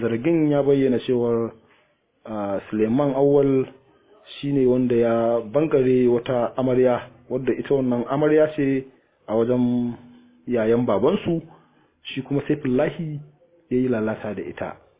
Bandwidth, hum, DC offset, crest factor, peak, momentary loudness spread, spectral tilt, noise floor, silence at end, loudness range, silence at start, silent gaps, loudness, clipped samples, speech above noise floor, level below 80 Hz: 4 kHz; none; under 0.1%; 14 dB; -6 dBFS; 13 LU; -11.5 dB/octave; -63 dBFS; 0.25 s; 4 LU; 0 s; none; -22 LUFS; under 0.1%; 42 dB; -54 dBFS